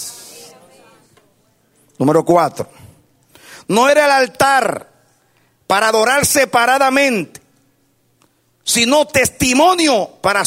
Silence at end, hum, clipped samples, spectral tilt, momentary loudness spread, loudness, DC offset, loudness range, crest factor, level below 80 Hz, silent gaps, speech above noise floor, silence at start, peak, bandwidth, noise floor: 0 s; none; under 0.1%; -3 dB/octave; 18 LU; -13 LUFS; under 0.1%; 6 LU; 16 dB; -48 dBFS; none; 46 dB; 0 s; 0 dBFS; 16 kHz; -59 dBFS